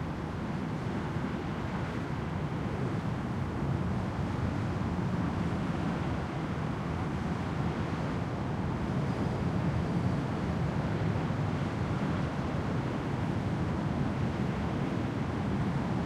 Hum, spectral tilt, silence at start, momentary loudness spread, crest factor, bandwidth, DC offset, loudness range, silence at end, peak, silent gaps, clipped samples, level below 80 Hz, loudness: none; -8 dB/octave; 0 s; 3 LU; 14 dB; 11.5 kHz; under 0.1%; 2 LU; 0 s; -18 dBFS; none; under 0.1%; -46 dBFS; -33 LUFS